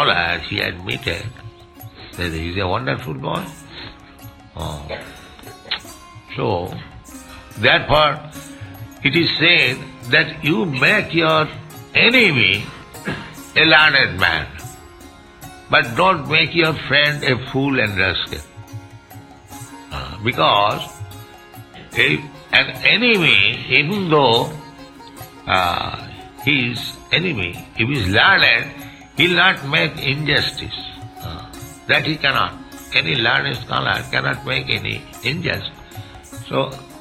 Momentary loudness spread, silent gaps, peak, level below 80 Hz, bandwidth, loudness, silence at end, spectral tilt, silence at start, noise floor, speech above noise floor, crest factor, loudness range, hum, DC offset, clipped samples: 23 LU; none; 0 dBFS; -44 dBFS; 16 kHz; -16 LUFS; 0 s; -4.5 dB/octave; 0 s; -41 dBFS; 24 dB; 20 dB; 11 LU; none; under 0.1%; under 0.1%